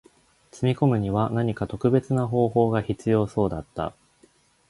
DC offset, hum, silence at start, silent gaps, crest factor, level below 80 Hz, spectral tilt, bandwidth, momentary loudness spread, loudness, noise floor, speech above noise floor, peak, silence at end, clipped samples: under 0.1%; none; 0.55 s; none; 18 dB; -50 dBFS; -8.5 dB/octave; 11.5 kHz; 8 LU; -24 LUFS; -60 dBFS; 37 dB; -6 dBFS; 0.8 s; under 0.1%